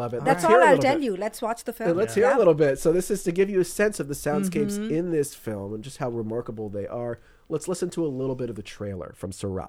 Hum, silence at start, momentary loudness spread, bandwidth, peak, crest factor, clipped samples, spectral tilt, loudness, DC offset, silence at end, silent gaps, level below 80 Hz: none; 0 s; 15 LU; 16.5 kHz; -6 dBFS; 20 dB; under 0.1%; -5.5 dB/octave; -24 LUFS; under 0.1%; 0 s; none; -50 dBFS